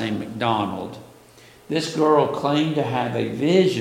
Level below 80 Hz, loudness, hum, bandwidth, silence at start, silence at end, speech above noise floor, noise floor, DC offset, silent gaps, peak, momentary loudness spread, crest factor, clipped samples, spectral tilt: -60 dBFS; -21 LUFS; none; 16.5 kHz; 0 s; 0 s; 28 dB; -49 dBFS; under 0.1%; none; -4 dBFS; 10 LU; 18 dB; under 0.1%; -6 dB/octave